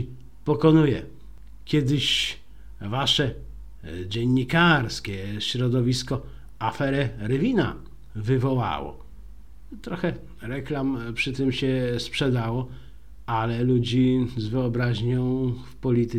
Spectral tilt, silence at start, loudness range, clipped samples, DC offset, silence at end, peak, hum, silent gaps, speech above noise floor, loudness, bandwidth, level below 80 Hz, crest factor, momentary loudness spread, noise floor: -6 dB/octave; 0 s; 5 LU; under 0.1%; 0.8%; 0 s; -6 dBFS; none; none; 22 dB; -24 LUFS; 13.5 kHz; -46 dBFS; 18 dB; 17 LU; -45 dBFS